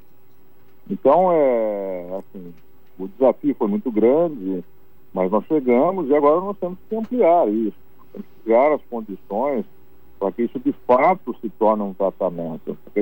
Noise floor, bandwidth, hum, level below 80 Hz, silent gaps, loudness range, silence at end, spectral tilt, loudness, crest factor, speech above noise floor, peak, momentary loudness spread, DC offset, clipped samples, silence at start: -56 dBFS; 16 kHz; none; -62 dBFS; none; 3 LU; 0 s; -10 dB/octave; -20 LUFS; 16 dB; 36 dB; -6 dBFS; 16 LU; 1%; under 0.1%; 0.9 s